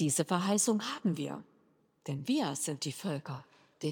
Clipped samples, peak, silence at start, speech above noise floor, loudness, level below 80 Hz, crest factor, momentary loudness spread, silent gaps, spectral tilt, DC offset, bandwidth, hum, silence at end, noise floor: under 0.1%; -16 dBFS; 0 s; 36 dB; -33 LUFS; -86 dBFS; 18 dB; 16 LU; none; -4.5 dB/octave; under 0.1%; over 20 kHz; none; 0 s; -69 dBFS